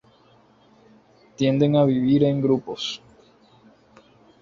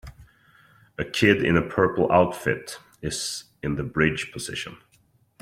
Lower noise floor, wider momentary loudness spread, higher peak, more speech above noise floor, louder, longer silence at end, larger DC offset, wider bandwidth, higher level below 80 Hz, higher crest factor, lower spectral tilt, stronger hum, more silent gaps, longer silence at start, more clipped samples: second, -56 dBFS vs -63 dBFS; second, 11 LU vs 15 LU; about the same, -6 dBFS vs -4 dBFS; about the same, 36 dB vs 39 dB; first, -21 LUFS vs -24 LUFS; first, 1.45 s vs 0.65 s; neither; second, 7.4 kHz vs 16 kHz; second, -60 dBFS vs -50 dBFS; about the same, 18 dB vs 20 dB; first, -7.5 dB/octave vs -5 dB/octave; neither; neither; first, 1.4 s vs 0.05 s; neither